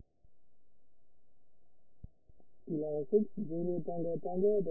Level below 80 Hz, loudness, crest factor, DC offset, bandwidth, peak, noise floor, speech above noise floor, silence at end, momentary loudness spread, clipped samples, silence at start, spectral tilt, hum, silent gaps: -66 dBFS; -35 LUFS; 20 dB; under 0.1%; 0.9 kHz; -18 dBFS; -78 dBFS; 44 dB; 0 s; 7 LU; under 0.1%; 0 s; -4.5 dB/octave; none; none